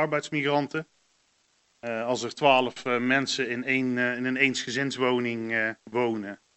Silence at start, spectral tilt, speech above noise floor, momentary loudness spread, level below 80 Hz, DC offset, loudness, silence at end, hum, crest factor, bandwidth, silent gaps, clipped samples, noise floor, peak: 0 s; -4 dB/octave; 42 dB; 8 LU; -76 dBFS; under 0.1%; -26 LUFS; 0.2 s; none; 22 dB; 8.4 kHz; none; under 0.1%; -68 dBFS; -6 dBFS